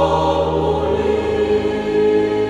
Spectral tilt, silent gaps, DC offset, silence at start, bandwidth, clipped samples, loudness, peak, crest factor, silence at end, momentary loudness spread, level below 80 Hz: -7 dB/octave; none; under 0.1%; 0 s; 9.6 kHz; under 0.1%; -17 LUFS; -4 dBFS; 14 dB; 0 s; 2 LU; -34 dBFS